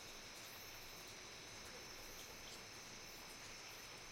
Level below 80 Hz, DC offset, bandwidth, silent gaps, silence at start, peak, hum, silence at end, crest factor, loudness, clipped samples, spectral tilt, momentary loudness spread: -68 dBFS; under 0.1%; 16.5 kHz; none; 0 s; -42 dBFS; none; 0 s; 14 dB; -53 LUFS; under 0.1%; -1.5 dB/octave; 1 LU